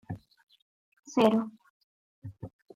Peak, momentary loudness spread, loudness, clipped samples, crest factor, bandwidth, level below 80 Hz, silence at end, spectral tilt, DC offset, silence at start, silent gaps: -10 dBFS; 24 LU; -28 LUFS; under 0.1%; 24 dB; 14 kHz; -68 dBFS; 0.25 s; -6 dB/octave; under 0.1%; 0.1 s; 0.43-0.47 s, 0.62-0.92 s, 0.99-1.03 s, 1.70-2.22 s